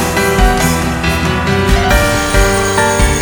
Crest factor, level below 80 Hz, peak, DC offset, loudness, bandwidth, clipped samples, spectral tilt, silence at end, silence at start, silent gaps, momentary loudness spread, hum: 12 dB; -18 dBFS; 0 dBFS; under 0.1%; -12 LUFS; over 20 kHz; under 0.1%; -4 dB/octave; 0 s; 0 s; none; 3 LU; none